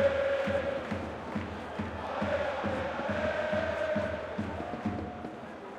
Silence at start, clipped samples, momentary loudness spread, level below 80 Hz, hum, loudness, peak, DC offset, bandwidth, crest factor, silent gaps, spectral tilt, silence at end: 0 s; under 0.1%; 8 LU; -56 dBFS; none; -33 LUFS; -16 dBFS; under 0.1%; 10.5 kHz; 16 dB; none; -6.5 dB/octave; 0 s